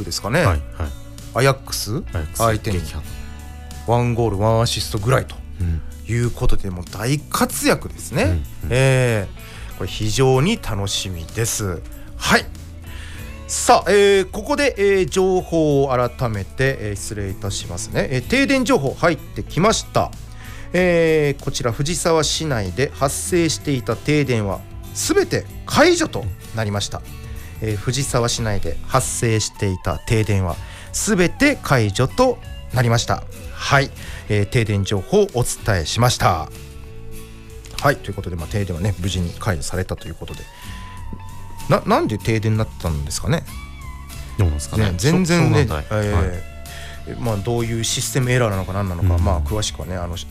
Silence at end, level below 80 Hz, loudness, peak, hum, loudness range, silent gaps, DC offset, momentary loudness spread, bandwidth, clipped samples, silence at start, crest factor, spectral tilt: 0 s; -32 dBFS; -20 LUFS; -4 dBFS; none; 4 LU; none; under 0.1%; 18 LU; 16 kHz; under 0.1%; 0 s; 16 dB; -5 dB/octave